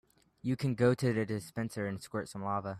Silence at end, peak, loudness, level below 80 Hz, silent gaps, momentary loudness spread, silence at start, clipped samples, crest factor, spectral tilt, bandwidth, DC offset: 0 s; -16 dBFS; -34 LUFS; -66 dBFS; none; 10 LU; 0.45 s; under 0.1%; 18 dB; -7 dB/octave; 14.5 kHz; under 0.1%